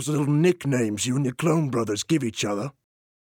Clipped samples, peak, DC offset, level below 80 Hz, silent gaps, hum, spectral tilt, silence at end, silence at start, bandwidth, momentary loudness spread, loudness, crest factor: under 0.1%; -10 dBFS; under 0.1%; -64 dBFS; none; none; -5.5 dB/octave; 0.55 s; 0 s; 17 kHz; 6 LU; -24 LUFS; 14 dB